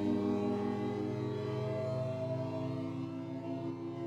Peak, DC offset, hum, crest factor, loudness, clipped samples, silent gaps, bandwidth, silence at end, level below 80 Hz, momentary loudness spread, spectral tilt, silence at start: -22 dBFS; under 0.1%; none; 14 dB; -37 LUFS; under 0.1%; none; 9.4 kHz; 0 s; -70 dBFS; 7 LU; -8.5 dB/octave; 0 s